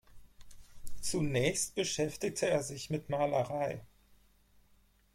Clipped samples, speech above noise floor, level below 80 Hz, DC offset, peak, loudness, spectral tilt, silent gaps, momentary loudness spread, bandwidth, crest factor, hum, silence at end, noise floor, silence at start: under 0.1%; 33 dB; -56 dBFS; under 0.1%; -18 dBFS; -34 LUFS; -4 dB/octave; none; 9 LU; 16.5 kHz; 18 dB; none; 1.3 s; -67 dBFS; 0.15 s